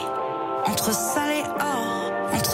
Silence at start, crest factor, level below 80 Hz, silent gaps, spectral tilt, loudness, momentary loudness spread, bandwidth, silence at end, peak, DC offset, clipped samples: 0 s; 14 dB; -58 dBFS; none; -3 dB/octave; -25 LUFS; 5 LU; 16 kHz; 0 s; -10 dBFS; under 0.1%; under 0.1%